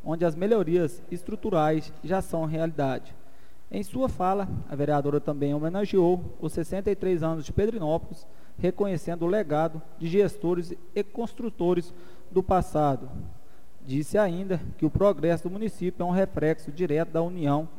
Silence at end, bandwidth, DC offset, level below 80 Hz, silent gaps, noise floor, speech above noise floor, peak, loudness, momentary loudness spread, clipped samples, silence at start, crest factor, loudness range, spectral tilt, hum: 0.1 s; 16 kHz; 2%; -48 dBFS; none; -56 dBFS; 29 dB; -10 dBFS; -27 LUFS; 10 LU; under 0.1%; 0.05 s; 16 dB; 2 LU; -8 dB/octave; none